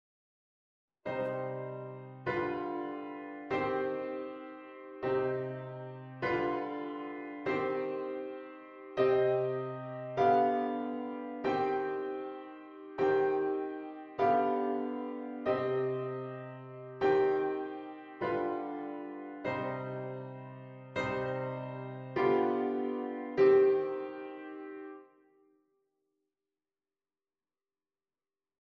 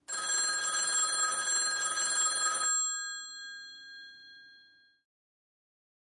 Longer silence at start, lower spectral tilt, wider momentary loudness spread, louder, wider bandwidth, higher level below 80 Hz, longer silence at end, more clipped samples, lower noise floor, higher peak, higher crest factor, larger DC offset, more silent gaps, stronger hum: first, 1.05 s vs 0.1 s; first, -8 dB/octave vs 3.5 dB/octave; about the same, 17 LU vs 19 LU; second, -34 LUFS vs -29 LUFS; second, 6.2 kHz vs 11.5 kHz; first, -72 dBFS vs -88 dBFS; first, 3.65 s vs 1.45 s; neither; first, under -90 dBFS vs -62 dBFS; about the same, -16 dBFS vs -18 dBFS; about the same, 18 dB vs 16 dB; neither; neither; neither